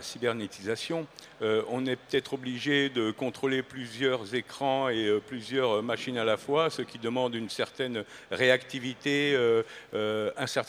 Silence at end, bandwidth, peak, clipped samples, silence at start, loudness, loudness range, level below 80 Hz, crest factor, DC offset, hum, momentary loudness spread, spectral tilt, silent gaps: 0 s; 15.5 kHz; -8 dBFS; under 0.1%; 0 s; -30 LUFS; 2 LU; -72 dBFS; 20 dB; under 0.1%; none; 9 LU; -4.5 dB/octave; none